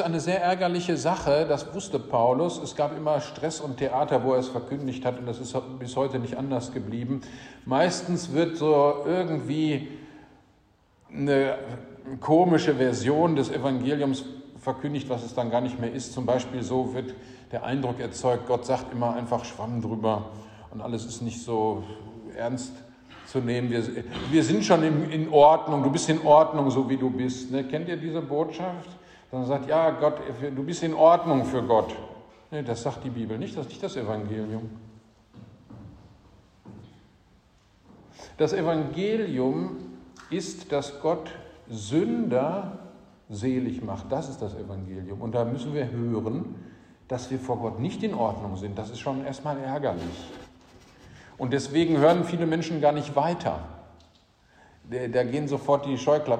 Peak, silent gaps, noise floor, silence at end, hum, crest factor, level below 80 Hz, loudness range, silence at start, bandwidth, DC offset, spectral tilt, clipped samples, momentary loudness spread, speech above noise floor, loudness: -4 dBFS; none; -62 dBFS; 0 s; none; 22 dB; -58 dBFS; 9 LU; 0 s; 10 kHz; under 0.1%; -6 dB/octave; under 0.1%; 16 LU; 36 dB; -26 LUFS